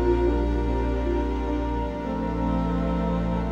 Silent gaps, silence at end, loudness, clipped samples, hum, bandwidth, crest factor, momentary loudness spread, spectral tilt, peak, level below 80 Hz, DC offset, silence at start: none; 0 s; -26 LUFS; under 0.1%; none; 7 kHz; 14 dB; 5 LU; -9 dB/octave; -10 dBFS; -28 dBFS; under 0.1%; 0 s